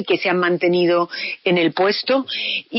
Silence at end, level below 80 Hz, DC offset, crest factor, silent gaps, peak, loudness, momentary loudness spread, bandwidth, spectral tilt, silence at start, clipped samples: 0 s; -70 dBFS; under 0.1%; 12 dB; none; -6 dBFS; -18 LUFS; 5 LU; 5.8 kHz; -3 dB/octave; 0 s; under 0.1%